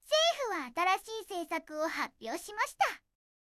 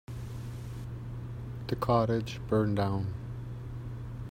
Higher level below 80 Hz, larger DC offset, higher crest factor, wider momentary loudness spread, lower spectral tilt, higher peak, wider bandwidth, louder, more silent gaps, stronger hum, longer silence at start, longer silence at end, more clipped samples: second, -74 dBFS vs -48 dBFS; neither; about the same, 16 dB vs 20 dB; about the same, 11 LU vs 13 LU; second, -0.5 dB/octave vs -8 dB/octave; second, -16 dBFS vs -12 dBFS; about the same, 16 kHz vs 16 kHz; about the same, -33 LUFS vs -34 LUFS; neither; neither; about the same, 0.05 s vs 0.1 s; first, 0.5 s vs 0 s; neither